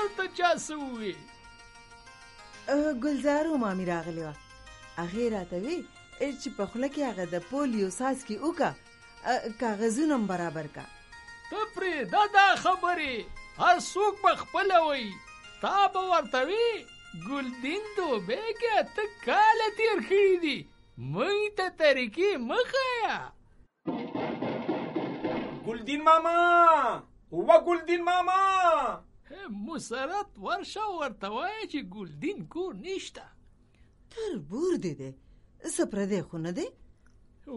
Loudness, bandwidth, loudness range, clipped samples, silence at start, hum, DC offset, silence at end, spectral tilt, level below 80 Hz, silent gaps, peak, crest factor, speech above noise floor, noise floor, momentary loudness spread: -28 LUFS; 11.5 kHz; 10 LU; under 0.1%; 0 s; none; under 0.1%; 0 s; -4.5 dB/octave; -60 dBFS; none; -8 dBFS; 22 dB; 32 dB; -60 dBFS; 17 LU